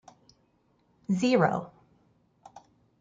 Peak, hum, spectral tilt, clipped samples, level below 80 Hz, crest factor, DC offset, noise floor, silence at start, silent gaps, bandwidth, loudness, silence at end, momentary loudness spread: -8 dBFS; none; -6.5 dB/octave; under 0.1%; -70 dBFS; 22 dB; under 0.1%; -69 dBFS; 1.1 s; none; 9.2 kHz; -27 LUFS; 0.4 s; 22 LU